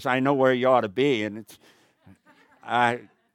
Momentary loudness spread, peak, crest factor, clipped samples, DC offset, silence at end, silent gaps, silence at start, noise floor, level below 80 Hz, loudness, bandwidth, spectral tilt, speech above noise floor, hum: 12 LU; -6 dBFS; 20 dB; under 0.1%; under 0.1%; 0.35 s; none; 0 s; -58 dBFS; -78 dBFS; -23 LUFS; 16.5 kHz; -6 dB/octave; 35 dB; none